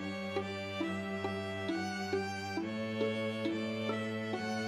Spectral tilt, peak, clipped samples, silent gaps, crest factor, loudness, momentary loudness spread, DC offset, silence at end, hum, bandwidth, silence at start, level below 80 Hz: -5.5 dB/octave; -20 dBFS; under 0.1%; none; 16 dB; -37 LUFS; 3 LU; under 0.1%; 0 s; none; 13.5 kHz; 0 s; -78 dBFS